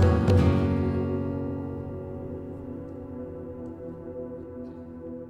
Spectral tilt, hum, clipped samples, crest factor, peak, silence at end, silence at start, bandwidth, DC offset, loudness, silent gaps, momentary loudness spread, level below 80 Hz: -9 dB/octave; none; under 0.1%; 18 dB; -10 dBFS; 0 s; 0 s; 8 kHz; under 0.1%; -29 LUFS; none; 18 LU; -40 dBFS